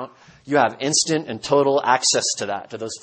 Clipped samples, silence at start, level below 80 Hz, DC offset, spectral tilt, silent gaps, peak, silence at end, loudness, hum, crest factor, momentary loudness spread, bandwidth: under 0.1%; 0 s; -64 dBFS; under 0.1%; -2.5 dB/octave; none; -2 dBFS; 0.05 s; -19 LUFS; none; 20 dB; 11 LU; 8.8 kHz